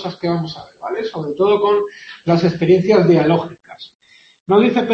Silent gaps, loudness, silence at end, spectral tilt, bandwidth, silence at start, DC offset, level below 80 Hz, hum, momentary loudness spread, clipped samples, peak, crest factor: 3.95-4.00 s, 4.40-4.46 s; -16 LUFS; 0 s; -8 dB/octave; 7.2 kHz; 0 s; under 0.1%; -54 dBFS; none; 17 LU; under 0.1%; -2 dBFS; 16 dB